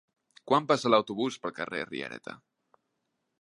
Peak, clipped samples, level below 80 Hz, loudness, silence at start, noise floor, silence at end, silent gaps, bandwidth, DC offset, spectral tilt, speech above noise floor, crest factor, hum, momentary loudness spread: -8 dBFS; under 0.1%; -76 dBFS; -29 LUFS; 0.45 s; -80 dBFS; 1.05 s; none; 11.5 kHz; under 0.1%; -5 dB/octave; 52 dB; 22 dB; none; 15 LU